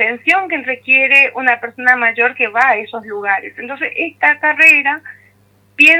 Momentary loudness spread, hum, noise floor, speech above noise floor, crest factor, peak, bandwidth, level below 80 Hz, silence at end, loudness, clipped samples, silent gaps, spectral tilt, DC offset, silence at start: 13 LU; 50 Hz at -55 dBFS; -52 dBFS; 38 dB; 14 dB; 0 dBFS; 19 kHz; -68 dBFS; 0 s; -12 LUFS; under 0.1%; none; -2.5 dB/octave; under 0.1%; 0 s